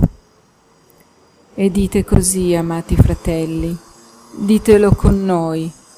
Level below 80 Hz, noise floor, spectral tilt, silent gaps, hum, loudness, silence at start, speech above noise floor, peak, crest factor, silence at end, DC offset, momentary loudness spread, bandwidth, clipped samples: -26 dBFS; -52 dBFS; -6.5 dB/octave; none; none; -15 LUFS; 0 s; 38 dB; 0 dBFS; 16 dB; 0.25 s; under 0.1%; 13 LU; 16 kHz; under 0.1%